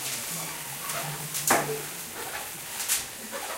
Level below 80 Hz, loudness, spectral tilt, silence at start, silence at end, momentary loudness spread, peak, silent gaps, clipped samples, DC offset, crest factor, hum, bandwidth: -64 dBFS; -29 LUFS; -1.5 dB/octave; 0 s; 0 s; 10 LU; -4 dBFS; none; under 0.1%; under 0.1%; 28 dB; none; 17 kHz